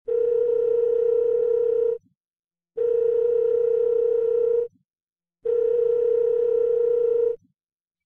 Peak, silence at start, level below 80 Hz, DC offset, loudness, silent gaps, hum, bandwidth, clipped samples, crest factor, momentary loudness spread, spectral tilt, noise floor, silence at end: -14 dBFS; 0.05 s; -68 dBFS; under 0.1%; -22 LUFS; 2.17-2.21 s, 2.27-2.31 s, 2.39-2.43 s, 5.03-5.07 s; none; 2.8 kHz; under 0.1%; 8 dB; 5 LU; -7.5 dB/octave; under -90 dBFS; 0.7 s